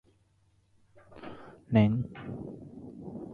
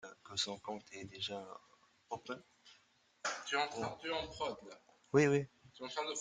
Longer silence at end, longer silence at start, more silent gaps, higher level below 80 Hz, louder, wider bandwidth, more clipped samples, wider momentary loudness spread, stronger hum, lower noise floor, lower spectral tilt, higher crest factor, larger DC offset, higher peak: about the same, 0 s vs 0 s; first, 1.1 s vs 0.05 s; neither; first, -58 dBFS vs -72 dBFS; first, -30 LUFS vs -39 LUFS; second, 4.7 kHz vs 9.6 kHz; neither; first, 22 LU vs 18 LU; neither; second, -68 dBFS vs -72 dBFS; first, -10 dB/octave vs -4 dB/octave; about the same, 22 dB vs 24 dB; neither; first, -12 dBFS vs -18 dBFS